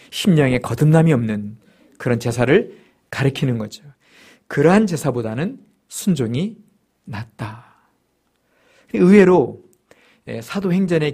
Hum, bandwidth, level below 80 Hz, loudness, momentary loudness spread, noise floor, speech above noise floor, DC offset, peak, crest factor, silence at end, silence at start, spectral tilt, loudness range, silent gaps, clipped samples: none; 15.5 kHz; -50 dBFS; -18 LUFS; 19 LU; -66 dBFS; 49 dB; under 0.1%; 0 dBFS; 18 dB; 0 s; 0.1 s; -7 dB/octave; 8 LU; none; under 0.1%